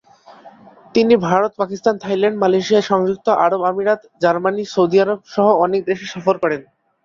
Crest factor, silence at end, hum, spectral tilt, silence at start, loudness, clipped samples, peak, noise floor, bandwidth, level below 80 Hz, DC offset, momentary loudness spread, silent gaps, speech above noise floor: 16 dB; 0.45 s; none; -6 dB/octave; 0.3 s; -17 LUFS; under 0.1%; -2 dBFS; -43 dBFS; 7.4 kHz; -60 dBFS; under 0.1%; 6 LU; none; 27 dB